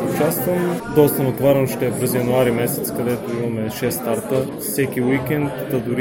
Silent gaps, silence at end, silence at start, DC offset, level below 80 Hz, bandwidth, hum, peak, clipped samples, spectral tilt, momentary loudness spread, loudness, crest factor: none; 0 s; 0 s; under 0.1%; -48 dBFS; 17 kHz; none; 0 dBFS; under 0.1%; -6 dB/octave; 6 LU; -20 LUFS; 18 dB